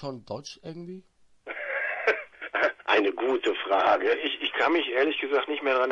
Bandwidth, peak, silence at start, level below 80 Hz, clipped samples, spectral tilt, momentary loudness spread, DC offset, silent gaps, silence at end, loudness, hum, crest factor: 7.4 kHz; -10 dBFS; 0 s; -70 dBFS; under 0.1%; -4.5 dB/octave; 17 LU; under 0.1%; none; 0 s; -26 LUFS; none; 18 dB